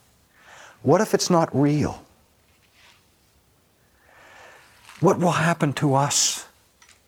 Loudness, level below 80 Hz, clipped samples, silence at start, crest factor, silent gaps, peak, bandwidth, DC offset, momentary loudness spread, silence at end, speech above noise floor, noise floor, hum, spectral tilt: -21 LUFS; -58 dBFS; under 0.1%; 0.85 s; 20 dB; none; -4 dBFS; 18 kHz; under 0.1%; 9 LU; 0.65 s; 41 dB; -61 dBFS; none; -4.5 dB/octave